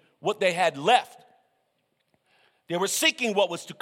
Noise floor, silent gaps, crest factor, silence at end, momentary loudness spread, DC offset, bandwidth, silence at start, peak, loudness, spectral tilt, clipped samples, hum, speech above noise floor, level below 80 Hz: -74 dBFS; none; 22 dB; 0.1 s; 9 LU; under 0.1%; 16.5 kHz; 0.25 s; -6 dBFS; -24 LUFS; -2.5 dB/octave; under 0.1%; none; 49 dB; -80 dBFS